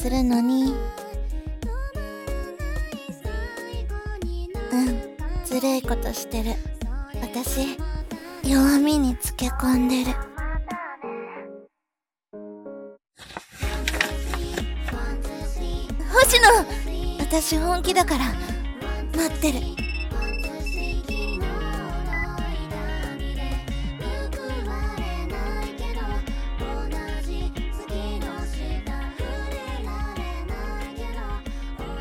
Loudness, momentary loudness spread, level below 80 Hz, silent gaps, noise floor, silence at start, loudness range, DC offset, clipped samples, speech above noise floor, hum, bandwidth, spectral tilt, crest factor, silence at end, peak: -26 LUFS; 13 LU; -30 dBFS; none; -88 dBFS; 0 s; 11 LU; under 0.1%; under 0.1%; 66 dB; none; 17.5 kHz; -4.5 dB/octave; 22 dB; 0 s; -2 dBFS